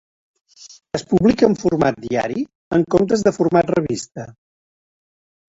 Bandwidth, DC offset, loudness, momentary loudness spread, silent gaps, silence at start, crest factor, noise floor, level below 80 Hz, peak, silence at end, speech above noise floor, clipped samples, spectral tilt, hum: 8 kHz; under 0.1%; -18 LUFS; 13 LU; 2.55-2.71 s; 0.6 s; 18 dB; under -90 dBFS; -48 dBFS; -2 dBFS; 1.15 s; over 73 dB; under 0.1%; -6.5 dB/octave; none